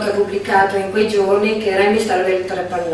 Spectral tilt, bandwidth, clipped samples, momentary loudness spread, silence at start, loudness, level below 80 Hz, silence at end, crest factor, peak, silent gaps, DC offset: -5 dB/octave; 12.5 kHz; under 0.1%; 5 LU; 0 s; -16 LUFS; -50 dBFS; 0 s; 16 dB; -2 dBFS; none; under 0.1%